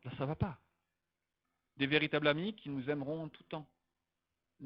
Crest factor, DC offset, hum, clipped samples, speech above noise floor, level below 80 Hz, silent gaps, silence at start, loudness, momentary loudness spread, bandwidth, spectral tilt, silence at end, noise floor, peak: 24 dB; under 0.1%; none; under 0.1%; 53 dB; -64 dBFS; none; 0.05 s; -36 LUFS; 16 LU; 5.6 kHz; -9 dB/octave; 0 s; -89 dBFS; -14 dBFS